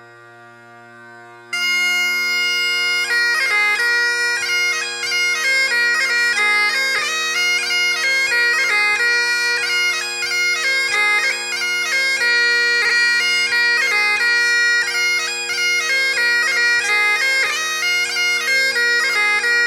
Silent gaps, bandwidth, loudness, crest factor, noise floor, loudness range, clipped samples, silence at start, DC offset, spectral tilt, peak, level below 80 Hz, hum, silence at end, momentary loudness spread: none; 18 kHz; -15 LUFS; 12 dB; -42 dBFS; 2 LU; under 0.1%; 0 s; under 0.1%; 1.5 dB/octave; -6 dBFS; -70 dBFS; none; 0 s; 4 LU